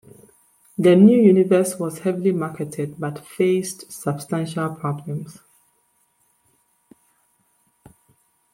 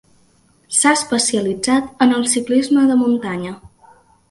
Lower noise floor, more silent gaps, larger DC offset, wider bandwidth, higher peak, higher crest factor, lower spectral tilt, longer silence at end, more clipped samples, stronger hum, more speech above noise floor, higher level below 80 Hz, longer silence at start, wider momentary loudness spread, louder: first, -65 dBFS vs -55 dBFS; neither; neither; first, 16 kHz vs 11.5 kHz; about the same, -2 dBFS vs 0 dBFS; about the same, 18 dB vs 16 dB; first, -7 dB/octave vs -3 dB/octave; first, 3.25 s vs 0.65 s; neither; neither; first, 46 dB vs 39 dB; second, -66 dBFS vs -56 dBFS; about the same, 0.8 s vs 0.7 s; first, 18 LU vs 11 LU; second, -20 LUFS vs -16 LUFS